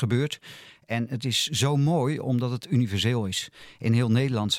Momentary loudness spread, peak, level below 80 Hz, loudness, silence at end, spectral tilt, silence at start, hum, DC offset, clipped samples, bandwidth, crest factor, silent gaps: 9 LU; -10 dBFS; -64 dBFS; -25 LUFS; 0 s; -5 dB/octave; 0 s; none; under 0.1%; under 0.1%; 16 kHz; 16 dB; none